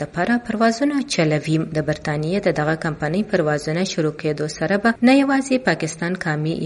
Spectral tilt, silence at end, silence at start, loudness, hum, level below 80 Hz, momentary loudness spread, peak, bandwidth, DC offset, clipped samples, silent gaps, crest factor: -5.5 dB/octave; 0 s; 0 s; -20 LUFS; none; -50 dBFS; 7 LU; -4 dBFS; 11.5 kHz; under 0.1%; under 0.1%; none; 16 dB